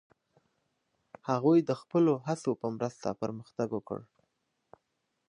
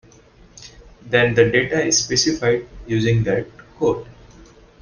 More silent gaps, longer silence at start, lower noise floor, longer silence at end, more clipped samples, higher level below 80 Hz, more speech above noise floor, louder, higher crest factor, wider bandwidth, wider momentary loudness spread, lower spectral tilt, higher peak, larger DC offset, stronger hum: neither; first, 1.25 s vs 0.6 s; first, -81 dBFS vs -48 dBFS; first, 1.25 s vs 0.4 s; neither; second, -74 dBFS vs -46 dBFS; first, 51 dB vs 30 dB; second, -31 LUFS vs -18 LUFS; about the same, 18 dB vs 18 dB; about the same, 10.5 kHz vs 10 kHz; first, 12 LU vs 9 LU; first, -7.5 dB/octave vs -4 dB/octave; second, -14 dBFS vs -2 dBFS; neither; neither